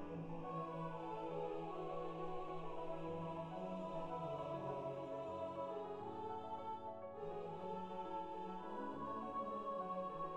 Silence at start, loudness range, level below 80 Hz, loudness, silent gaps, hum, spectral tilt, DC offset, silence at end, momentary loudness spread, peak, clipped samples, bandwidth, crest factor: 0 s; 1 LU; -66 dBFS; -47 LUFS; none; none; -8 dB/octave; under 0.1%; 0 s; 3 LU; -34 dBFS; under 0.1%; 9.6 kHz; 12 dB